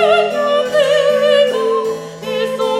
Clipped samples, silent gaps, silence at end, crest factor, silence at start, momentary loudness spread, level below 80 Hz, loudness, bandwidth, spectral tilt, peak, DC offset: under 0.1%; none; 0 s; 12 dB; 0 s; 10 LU; -58 dBFS; -14 LUFS; 14.5 kHz; -3.5 dB/octave; -2 dBFS; under 0.1%